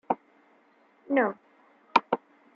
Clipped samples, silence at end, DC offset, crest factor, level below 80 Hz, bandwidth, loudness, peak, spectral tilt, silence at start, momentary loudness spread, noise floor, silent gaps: under 0.1%; 0.4 s; under 0.1%; 26 dB; -80 dBFS; 7.6 kHz; -28 LUFS; -4 dBFS; -5.5 dB/octave; 0.1 s; 8 LU; -63 dBFS; none